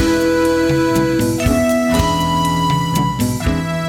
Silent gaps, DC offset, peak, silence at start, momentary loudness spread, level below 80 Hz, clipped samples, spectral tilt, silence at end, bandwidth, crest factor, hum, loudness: none; under 0.1%; -2 dBFS; 0 s; 3 LU; -30 dBFS; under 0.1%; -5.5 dB/octave; 0 s; 18 kHz; 14 dB; none; -16 LUFS